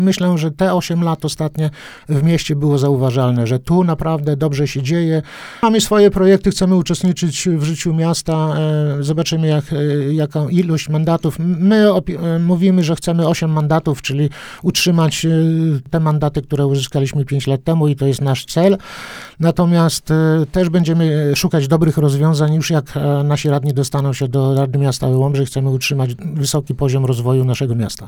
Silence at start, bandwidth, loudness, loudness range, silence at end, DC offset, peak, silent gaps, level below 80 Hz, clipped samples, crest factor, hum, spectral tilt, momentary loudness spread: 0 s; 17.5 kHz; -16 LUFS; 2 LU; 0 s; under 0.1%; 0 dBFS; none; -42 dBFS; under 0.1%; 14 dB; none; -6.5 dB/octave; 5 LU